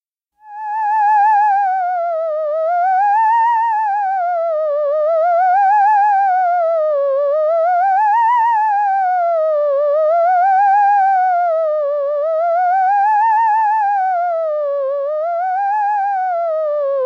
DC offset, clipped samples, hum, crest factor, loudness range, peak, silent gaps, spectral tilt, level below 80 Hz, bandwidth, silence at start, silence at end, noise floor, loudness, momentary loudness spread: under 0.1%; under 0.1%; none; 8 dB; 2 LU; -6 dBFS; none; 1 dB/octave; under -90 dBFS; 6.6 kHz; 0.45 s; 0 s; -47 dBFS; -15 LUFS; 6 LU